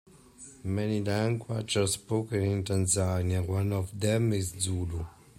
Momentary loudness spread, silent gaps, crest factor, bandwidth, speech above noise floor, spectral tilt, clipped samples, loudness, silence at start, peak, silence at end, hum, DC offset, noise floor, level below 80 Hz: 8 LU; none; 16 dB; 15.5 kHz; 23 dB; -5 dB/octave; under 0.1%; -30 LUFS; 0.4 s; -14 dBFS; 0.25 s; none; under 0.1%; -51 dBFS; -56 dBFS